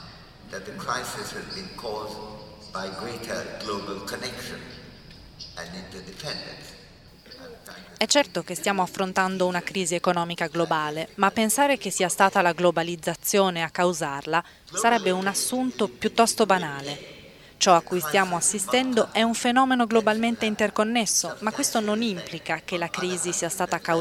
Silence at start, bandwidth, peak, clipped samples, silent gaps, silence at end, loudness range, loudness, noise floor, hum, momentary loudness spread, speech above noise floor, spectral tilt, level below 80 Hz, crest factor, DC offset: 0 s; 17 kHz; -4 dBFS; under 0.1%; none; 0 s; 12 LU; -24 LUFS; -49 dBFS; none; 17 LU; 24 dB; -3 dB/octave; -58 dBFS; 22 dB; under 0.1%